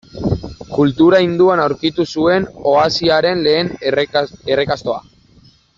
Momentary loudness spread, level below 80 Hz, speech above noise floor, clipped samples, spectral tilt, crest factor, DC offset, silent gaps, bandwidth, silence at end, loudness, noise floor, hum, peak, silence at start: 10 LU; -44 dBFS; 34 dB; under 0.1%; -6 dB/octave; 14 dB; under 0.1%; none; 7.6 kHz; 0.8 s; -15 LUFS; -49 dBFS; none; -2 dBFS; 0.15 s